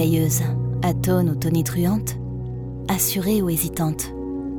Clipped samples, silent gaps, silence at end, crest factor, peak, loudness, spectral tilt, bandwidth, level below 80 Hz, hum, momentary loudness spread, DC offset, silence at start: under 0.1%; none; 0 s; 14 dB; -6 dBFS; -22 LUFS; -5.5 dB/octave; over 20 kHz; -40 dBFS; none; 10 LU; under 0.1%; 0 s